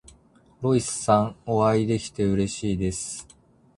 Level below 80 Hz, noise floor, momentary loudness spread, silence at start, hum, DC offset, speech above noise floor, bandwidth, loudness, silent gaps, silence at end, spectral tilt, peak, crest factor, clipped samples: -48 dBFS; -56 dBFS; 9 LU; 0.6 s; none; under 0.1%; 33 dB; 11.5 kHz; -24 LUFS; none; 0.55 s; -5.5 dB/octave; -4 dBFS; 22 dB; under 0.1%